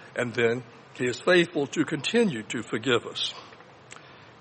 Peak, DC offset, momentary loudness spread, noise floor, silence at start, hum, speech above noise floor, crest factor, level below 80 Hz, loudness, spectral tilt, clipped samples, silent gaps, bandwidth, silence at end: -8 dBFS; under 0.1%; 24 LU; -48 dBFS; 0 s; none; 22 dB; 20 dB; -70 dBFS; -26 LUFS; -4.5 dB/octave; under 0.1%; none; 8.8 kHz; 0.15 s